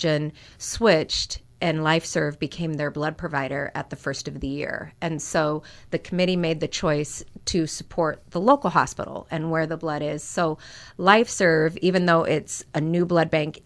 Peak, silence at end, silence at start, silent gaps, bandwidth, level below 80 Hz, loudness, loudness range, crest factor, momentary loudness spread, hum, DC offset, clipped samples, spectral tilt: -2 dBFS; 0.15 s; 0 s; none; 11 kHz; -50 dBFS; -24 LUFS; 6 LU; 22 dB; 11 LU; none; under 0.1%; under 0.1%; -5 dB/octave